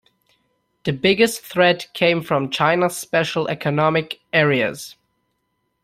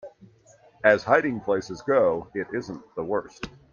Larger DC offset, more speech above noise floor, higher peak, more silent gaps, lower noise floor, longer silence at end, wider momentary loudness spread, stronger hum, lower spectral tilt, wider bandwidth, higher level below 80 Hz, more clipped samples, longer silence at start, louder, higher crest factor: neither; first, 53 dB vs 32 dB; about the same, -2 dBFS vs -4 dBFS; neither; first, -72 dBFS vs -56 dBFS; first, 0.9 s vs 0.25 s; second, 8 LU vs 14 LU; neither; second, -4.5 dB/octave vs -6 dB/octave; first, 16 kHz vs 7.4 kHz; about the same, -58 dBFS vs -60 dBFS; neither; first, 0.85 s vs 0.05 s; first, -19 LUFS vs -24 LUFS; about the same, 18 dB vs 22 dB